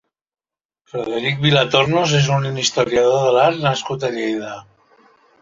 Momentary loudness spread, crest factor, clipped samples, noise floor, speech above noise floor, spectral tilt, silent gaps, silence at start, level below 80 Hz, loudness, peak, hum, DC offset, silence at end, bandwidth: 12 LU; 18 dB; under 0.1%; -77 dBFS; 60 dB; -4.5 dB/octave; none; 0.95 s; -54 dBFS; -17 LUFS; -2 dBFS; none; under 0.1%; 0.8 s; 7.6 kHz